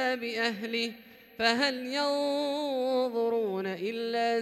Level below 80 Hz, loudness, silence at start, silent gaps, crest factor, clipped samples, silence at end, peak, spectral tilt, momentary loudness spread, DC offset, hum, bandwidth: -74 dBFS; -30 LUFS; 0 s; none; 18 dB; under 0.1%; 0 s; -12 dBFS; -3.5 dB/octave; 6 LU; under 0.1%; none; 16 kHz